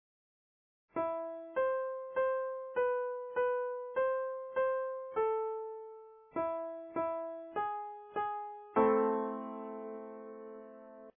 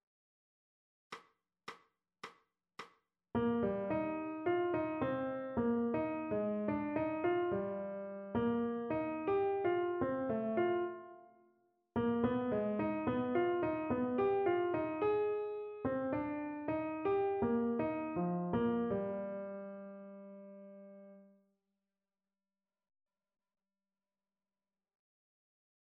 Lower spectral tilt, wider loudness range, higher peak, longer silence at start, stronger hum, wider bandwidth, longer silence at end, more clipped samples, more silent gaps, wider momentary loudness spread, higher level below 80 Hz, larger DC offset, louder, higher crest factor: second, 0.5 dB/octave vs -6.5 dB/octave; second, 3 LU vs 8 LU; first, -16 dBFS vs -20 dBFS; second, 0.95 s vs 1.1 s; neither; second, 3.5 kHz vs 6 kHz; second, 0.1 s vs 4.75 s; neither; neither; second, 14 LU vs 19 LU; second, -78 dBFS vs -68 dBFS; neither; about the same, -36 LUFS vs -37 LUFS; about the same, 20 dB vs 18 dB